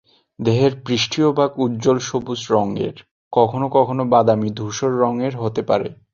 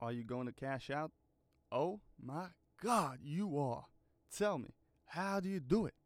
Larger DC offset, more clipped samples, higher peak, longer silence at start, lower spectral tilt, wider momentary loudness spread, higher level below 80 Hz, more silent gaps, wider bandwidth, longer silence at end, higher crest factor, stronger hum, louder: neither; neither; first, -2 dBFS vs -20 dBFS; first, 0.4 s vs 0 s; about the same, -6 dB/octave vs -6 dB/octave; second, 8 LU vs 12 LU; first, -54 dBFS vs -68 dBFS; first, 3.11-3.31 s vs none; second, 7.6 kHz vs 16.5 kHz; about the same, 0.2 s vs 0.15 s; about the same, 18 dB vs 22 dB; neither; first, -19 LUFS vs -40 LUFS